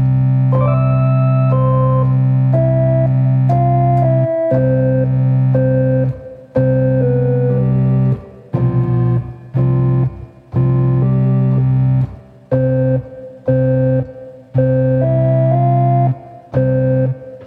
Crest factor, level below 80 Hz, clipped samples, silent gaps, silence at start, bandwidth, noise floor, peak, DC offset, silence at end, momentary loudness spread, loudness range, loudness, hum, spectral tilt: 12 dB; -38 dBFS; under 0.1%; none; 0 s; 2.8 kHz; -33 dBFS; -2 dBFS; under 0.1%; 0 s; 8 LU; 3 LU; -15 LUFS; none; -12.5 dB/octave